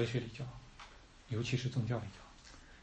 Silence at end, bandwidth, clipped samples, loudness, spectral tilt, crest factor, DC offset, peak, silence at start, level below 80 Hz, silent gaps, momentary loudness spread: 0 s; 8.4 kHz; under 0.1%; -39 LUFS; -6 dB/octave; 18 dB; under 0.1%; -22 dBFS; 0 s; -60 dBFS; none; 20 LU